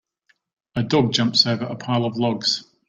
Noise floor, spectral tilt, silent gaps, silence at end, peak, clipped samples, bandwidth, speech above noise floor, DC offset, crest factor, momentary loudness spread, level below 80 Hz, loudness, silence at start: -65 dBFS; -5 dB/octave; none; 0.25 s; -2 dBFS; under 0.1%; 9.2 kHz; 45 dB; under 0.1%; 20 dB; 9 LU; -58 dBFS; -20 LUFS; 0.75 s